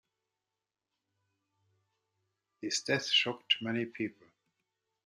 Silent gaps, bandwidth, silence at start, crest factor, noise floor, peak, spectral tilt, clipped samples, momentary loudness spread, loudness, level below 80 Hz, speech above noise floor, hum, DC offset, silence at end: none; 13.5 kHz; 2.6 s; 24 dB; under -90 dBFS; -14 dBFS; -2.5 dB/octave; under 0.1%; 12 LU; -31 LUFS; -84 dBFS; over 57 dB; none; under 0.1%; 0.95 s